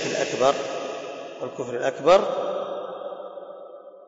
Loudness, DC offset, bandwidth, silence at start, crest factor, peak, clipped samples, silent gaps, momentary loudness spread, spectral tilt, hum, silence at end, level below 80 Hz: -25 LUFS; under 0.1%; 7.8 kHz; 0 s; 20 dB; -6 dBFS; under 0.1%; none; 20 LU; -3.5 dB/octave; none; 0 s; -64 dBFS